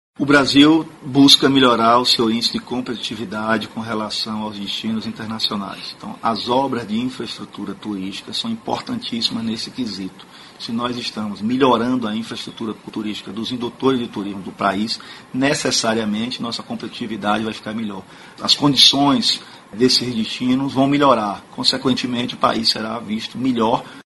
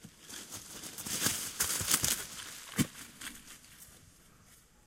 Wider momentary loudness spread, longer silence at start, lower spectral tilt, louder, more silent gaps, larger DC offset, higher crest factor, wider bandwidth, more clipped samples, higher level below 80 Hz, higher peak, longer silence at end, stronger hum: second, 14 LU vs 23 LU; first, 0.2 s vs 0 s; first, -4 dB/octave vs -1.5 dB/octave; first, -18 LUFS vs -34 LUFS; neither; neither; second, 20 dB vs 30 dB; second, 11.5 kHz vs 16.5 kHz; neither; first, -56 dBFS vs -62 dBFS; first, 0 dBFS vs -8 dBFS; second, 0.1 s vs 0.25 s; neither